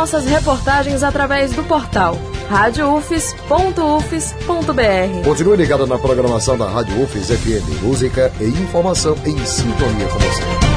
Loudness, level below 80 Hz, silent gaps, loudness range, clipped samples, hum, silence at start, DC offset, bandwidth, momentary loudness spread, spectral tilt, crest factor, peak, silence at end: -16 LUFS; -26 dBFS; none; 2 LU; under 0.1%; none; 0 s; under 0.1%; 11 kHz; 5 LU; -5 dB/octave; 16 dB; 0 dBFS; 0 s